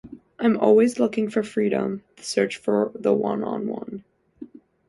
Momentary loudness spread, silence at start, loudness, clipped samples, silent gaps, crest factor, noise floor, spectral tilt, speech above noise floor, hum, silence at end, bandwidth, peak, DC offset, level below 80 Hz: 14 LU; 0.05 s; -23 LUFS; under 0.1%; none; 18 dB; -44 dBFS; -6 dB/octave; 22 dB; none; 0.45 s; 11.5 kHz; -4 dBFS; under 0.1%; -64 dBFS